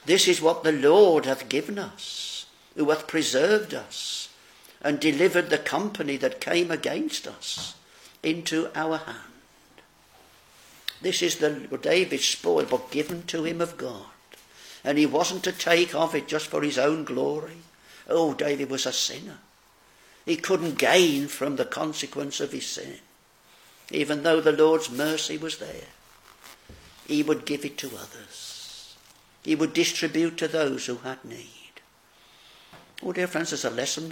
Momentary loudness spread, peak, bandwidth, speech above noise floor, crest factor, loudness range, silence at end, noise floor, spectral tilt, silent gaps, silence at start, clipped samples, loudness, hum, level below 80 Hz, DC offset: 17 LU; -4 dBFS; 17 kHz; 33 dB; 24 dB; 7 LU; 0 s; -58 dBFS; -3 dB/octave; none; 0.05 s; under 0.1%; -25 LUFS; none; -68 dBFS; under 0.1%